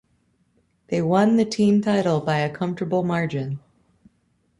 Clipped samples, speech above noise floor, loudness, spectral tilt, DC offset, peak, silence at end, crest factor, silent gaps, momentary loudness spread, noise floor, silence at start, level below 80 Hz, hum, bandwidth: under 0.1%; 46 dB; -22 LUFS; -7 dB/octave; under 0.1%; -6 dBFS; 1 s; 18 dB; none; 10 LU; -66 dBFS; 0.9 s; -60 dBFS; none; 11 kHz